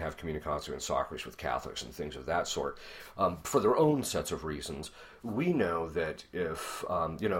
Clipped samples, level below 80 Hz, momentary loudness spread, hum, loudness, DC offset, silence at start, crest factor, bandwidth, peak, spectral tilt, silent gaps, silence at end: under 0.1%; -54 dBFS; 13 LU; none; -33 LUFS; under 0.1%; 0 s; 20 dB; 16 kHz; -12 dBFS; -5 dB/octave; none; 0 s